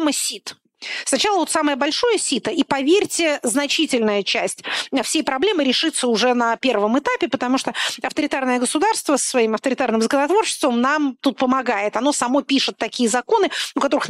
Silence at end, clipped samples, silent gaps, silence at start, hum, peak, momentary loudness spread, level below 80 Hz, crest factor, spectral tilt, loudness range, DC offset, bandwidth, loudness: 0 s; under 0.1%; none; 0 s; none; -6 dBFS; 5 LU; -62 dBFS; 14 dB; -2 dB/octave; 1 LU; under 0.1%; 16 kHz; -19 LUFS